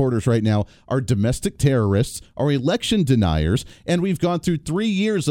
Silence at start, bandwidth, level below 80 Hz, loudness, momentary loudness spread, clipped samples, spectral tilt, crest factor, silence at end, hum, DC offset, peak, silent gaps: 0 s; 16.5 kHz; -40 dBFS; -21 LUFS; 6 LU; under 0.1%; -6.5 dB/octave; 16 dB; 0 s; none; under 0.1%; -4 dBFS; none